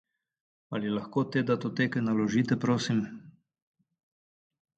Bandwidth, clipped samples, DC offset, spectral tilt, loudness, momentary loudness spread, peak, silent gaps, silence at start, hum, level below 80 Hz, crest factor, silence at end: 8.8 kHz; under 0.1%; under 0.1%; -6.5 dB/octave; -29 LUFS; 9 LU; -14 dBFS; none; 0.7 s; none; -70 dBFS; 18 dB; 1.5 s